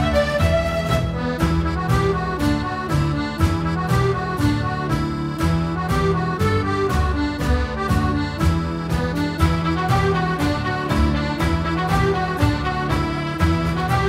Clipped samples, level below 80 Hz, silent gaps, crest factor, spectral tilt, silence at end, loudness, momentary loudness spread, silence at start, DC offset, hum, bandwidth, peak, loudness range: under 0.1%; -28 dBFS; none; 16 dB; -6.5 dB/octave; 0 s; -21 LUFS; 4 LU; 0 s; under 0.1%; none; 16 kHz; -4 dBFS; 1 LU